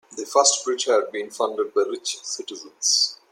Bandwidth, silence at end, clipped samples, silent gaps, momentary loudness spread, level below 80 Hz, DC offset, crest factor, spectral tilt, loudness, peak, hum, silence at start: 16.5 kHz; 0.15 s; under 0.1%; none; 13 LU; -82 dBFS; under 0.1%; 22 dB; 1 dB/octave; -22 LUFS; -2 dBFS; none; 0.1 s